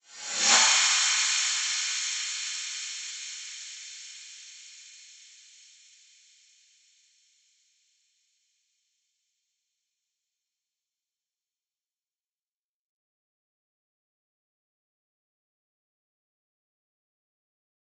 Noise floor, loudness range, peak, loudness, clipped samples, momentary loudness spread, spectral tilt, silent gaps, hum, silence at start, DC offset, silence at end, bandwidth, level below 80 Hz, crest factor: under -90 dBFS; 25 LU; -8 dBFS; -24 LUFS; under 0.1%; 26 LU; 3.5 dB/octave; none; none; 0.1 s; under 0.1%; 12.85 s; 8.4 kHz; under -90 dBFS; 26 dB